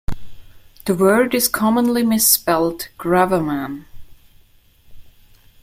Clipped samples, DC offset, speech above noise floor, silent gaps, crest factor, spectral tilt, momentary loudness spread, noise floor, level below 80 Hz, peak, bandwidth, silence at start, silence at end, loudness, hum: under 0.1%; under 0.1%; 35 dB; none; 20 dB; -3.5 dB/octave; 17 LU; -51 dBFS; -40 dBFS; 0 dBFS; 16.5 kHz; 0.1 s; 0.55 s; -17 LUFS; none